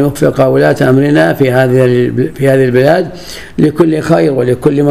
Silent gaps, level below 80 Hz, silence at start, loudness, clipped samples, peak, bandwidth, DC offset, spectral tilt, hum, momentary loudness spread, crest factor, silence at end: none; -40 dBFS; 0 s; -9 LUFS; 0.5%; 0 dBFS; 15 kHz; 1%; -7.5 dB/octave; none; 5 LU; 10 dB; 0 s